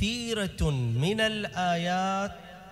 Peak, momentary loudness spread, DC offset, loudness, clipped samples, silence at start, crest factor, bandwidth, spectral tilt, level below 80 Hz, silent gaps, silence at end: -14 dBFS; 6 LU; under 0.1%; -28 LUFS; under 0.1%; 0 s; 14 dB; 15 kHz; -5 dB/octave; -44 dBFS; none; 0 s